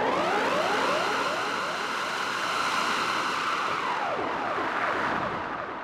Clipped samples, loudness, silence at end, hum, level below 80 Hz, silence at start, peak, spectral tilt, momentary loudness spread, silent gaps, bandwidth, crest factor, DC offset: under 0.1%; -27 LUFS; 0 s; none; -62 dBFS; 0 s; -14 dBFS; -3 dB/octave; 4 LU; none; 16 kHz; 14 dB; under 0.1%